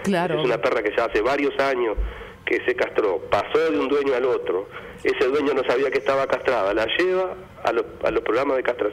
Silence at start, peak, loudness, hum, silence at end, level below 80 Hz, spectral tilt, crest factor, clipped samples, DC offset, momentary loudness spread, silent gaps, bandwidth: 0 s; -8 dBFS; -22 LUFS; none; 0 s; -42 dBFS; -5.5 dB/octave; 14 dB; under 0.1%; under 0.1%; 6 LU; none; 13.5 kHz